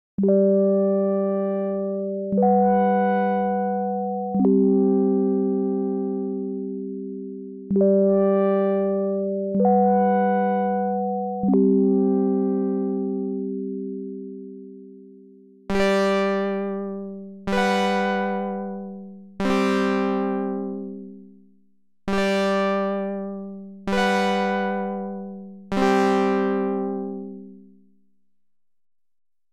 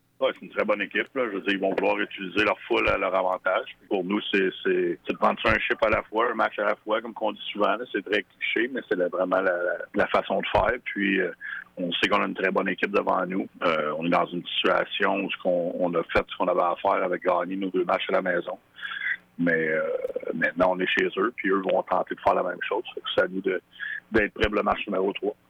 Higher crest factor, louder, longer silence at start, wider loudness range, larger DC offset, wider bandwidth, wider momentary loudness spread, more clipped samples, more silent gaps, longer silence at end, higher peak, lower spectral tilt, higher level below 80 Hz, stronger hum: about the same, 14 dB vs 16 dB; first, -22 LUFS vs -25 LUFS; about the same, 0.2 s vs 0.2 s; first, 6 LU vs 2 LU; neither; about the same, 10.5 kHz vs 10 kHz; first, 16 LU vs 6 LU; neither; neither; first, 1.9 s vs 0.15 s; about the same, -8 dBFS vs -10 dBFS; first, -7.5 dB/octave vs -6 dB/octave; about the same, -54 dBFS vs -52 dBFS; neither